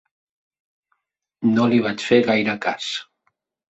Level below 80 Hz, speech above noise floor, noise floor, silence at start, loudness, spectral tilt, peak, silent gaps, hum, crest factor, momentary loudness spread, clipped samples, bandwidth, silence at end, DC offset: -64 dBFS; 54 dB; -73 dBFS; 1.4 s; -20 LUFS; -5.5 dB/octave; -2 dBFS; none; none; 20 dB; 10 LU; under 0.1%; 8 kHz; 0.65 s; under 0.1%